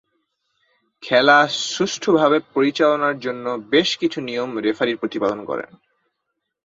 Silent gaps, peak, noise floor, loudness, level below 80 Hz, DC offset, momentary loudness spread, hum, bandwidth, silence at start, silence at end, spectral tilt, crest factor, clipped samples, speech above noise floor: none; -2 dBFS; -77 dBFS; -19 LUFS; -66 dBFS; under 0.1%; 12 LU; none; 7.8 kHz; 1 s; 1 s; -3.5 dB/octave; 20 dB; under 0.1%; 58 dB